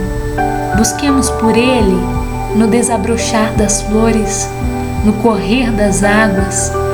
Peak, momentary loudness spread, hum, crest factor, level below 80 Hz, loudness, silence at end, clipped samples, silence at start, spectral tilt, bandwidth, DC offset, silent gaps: 0 dBFS; 6 LU; none; 12 dB; -24 dBFS; -13 LUFS; 0 s; under 0.1%; 0 s; -4.5 dB/octave; over 20 kHz; under 0.1%; none